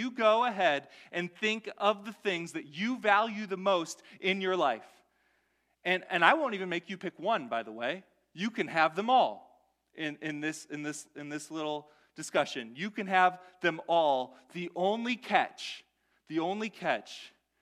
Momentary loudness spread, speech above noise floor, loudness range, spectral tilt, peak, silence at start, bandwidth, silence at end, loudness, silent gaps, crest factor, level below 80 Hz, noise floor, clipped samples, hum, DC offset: 14 LU; 44 dB; 3 LU; -4 dB/octave; -8 dBFS; 0 s; 14 kHz; 0.35 s; -31 LUFS; none; 24 dB; -84 dBFS; -75 dBFS; under 0.1%; none; under 0.1%